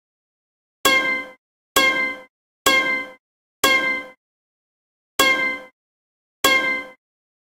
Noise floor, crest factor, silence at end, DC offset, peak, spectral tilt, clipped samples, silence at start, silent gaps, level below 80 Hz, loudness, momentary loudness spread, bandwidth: under -90 dBFS; 22 dB; 0.55 s; under 0.1%; 0 dBFS; -0.5 dB/octave; under 0.1%; 0.85 s; 1.38-1.75 s, 2.30-2.65 s, 3.20-3.63 s, 4.17-5.19 s, 5.73-6.44 s; -56 dBFS; -19 LUFS; 13 LU; 16 kHz